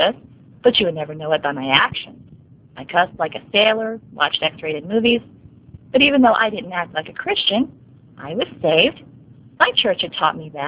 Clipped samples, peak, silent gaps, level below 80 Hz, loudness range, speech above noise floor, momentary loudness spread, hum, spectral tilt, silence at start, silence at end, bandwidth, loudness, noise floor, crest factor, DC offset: under 0.1%; 0 dBFS; none; -54 dBFS; 2 LU; 27 dB; 12 LU; none; -8 dB/octave; 0 s; 0 s; 4 kHz; -18 LUFS; -46 dBFS; 20 dB; under 0.1%